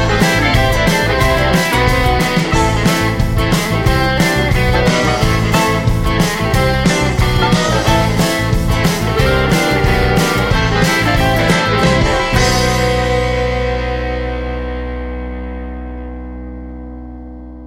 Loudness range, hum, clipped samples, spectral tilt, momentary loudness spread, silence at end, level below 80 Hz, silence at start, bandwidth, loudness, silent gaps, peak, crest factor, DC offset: 7 LU; none; under 0.1%; -5 dB/octave; 14 LU; 0 s; -22 dBFS; 0 s; 16.5 kHz; -14 LUFS; none; 0 dBFS; 14 dB; under 0.1%